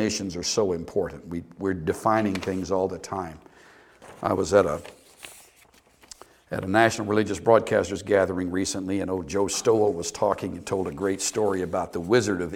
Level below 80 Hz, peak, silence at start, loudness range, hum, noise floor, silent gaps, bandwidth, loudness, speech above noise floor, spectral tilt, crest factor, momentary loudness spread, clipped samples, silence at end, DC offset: -54 dBFS; -4 dBFS; 0 s; 5 LU; none; -57 dBFS; none; 17 kHz; -25 LUFS; 33 dB; -4.5 dB/octave; 22 dB; 12 LU; under 0.1%; 0 s; under 0.1%